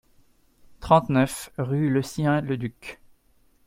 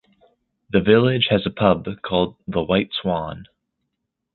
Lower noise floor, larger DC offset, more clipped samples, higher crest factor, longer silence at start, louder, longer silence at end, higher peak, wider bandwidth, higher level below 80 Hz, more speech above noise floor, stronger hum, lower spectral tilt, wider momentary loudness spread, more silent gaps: second, -61 dBFS vs -78 dBFS; neither; neither; about the same, 22 dB vs 20 dB; about the same, 0.8 s vs 0.75 s; second, -24 LUFS vs -20 LUFS; second, 0.7 s vs 0.9 s; about the same, -4 dBFS vs -2 dBFS; first, 16 kHz vs 4.4 kHz; second, -52 dBFS vs -46 dBFS; second, 38 dB vs 59 dB; neither; second, -6.5 dB/octave vs -10.5 dB/octave; first, 19 LU vs 10 LU; neither